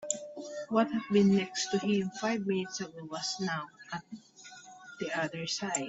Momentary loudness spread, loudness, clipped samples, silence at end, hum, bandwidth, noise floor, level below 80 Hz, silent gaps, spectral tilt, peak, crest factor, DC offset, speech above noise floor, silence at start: 22 LU; -32 LUFS; under 0.1%; 0 s; none; 8 kHz; -52 dBFS; -72 dBFS; none; -4.5 dB/octave; -12 dBFS; 20 dB; under 0.1%; 21 dB; 0 s